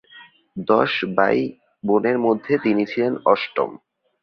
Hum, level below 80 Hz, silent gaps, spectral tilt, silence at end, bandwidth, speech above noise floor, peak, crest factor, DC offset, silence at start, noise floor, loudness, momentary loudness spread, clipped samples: none; -64 dBFS; none; -7.5 dB/octave; 0.45 s; 6.2 kHz; 28 dB; -2 dBFS; 20 dB; under 0.1%; 0.15 s; -48 dBFS; -20 LUFS; 11 LU; under 0.1%